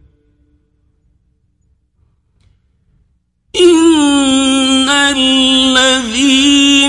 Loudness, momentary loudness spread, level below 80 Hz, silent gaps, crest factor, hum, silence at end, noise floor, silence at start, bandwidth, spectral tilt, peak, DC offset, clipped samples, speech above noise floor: -9 LUFS; 3 LU; -44 dBFS; none; 12 dB; none; 0 s; -58 dBFS; 3.55 s; 11.5 kHz; -1.5 dB/octave; 0 dBFS; under 0.1%; under 0.1%; 48 dB